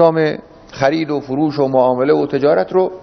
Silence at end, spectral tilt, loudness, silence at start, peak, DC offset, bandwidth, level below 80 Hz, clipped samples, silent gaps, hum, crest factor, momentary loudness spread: 0 s; -7.5 dB/octave; -15 LUFS; 0 s; 0 dBFS; under 0.1%; 6.4 kHz; -52 dBFS; under 0.1%; none; none; 14 dB; 6 LU